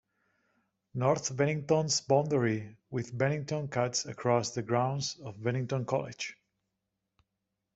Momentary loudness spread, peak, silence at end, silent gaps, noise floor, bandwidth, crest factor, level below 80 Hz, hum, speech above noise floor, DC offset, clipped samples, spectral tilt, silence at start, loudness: 10 LU; -12 dBFS; 1.4 s; none; -85 dBFS; 8.2 kHz; 20 dB; -70 dBFS; none; 54 dB; under 0.1%; under 0.1%; -5 dB/octave; 0.95 s; -31 LUFS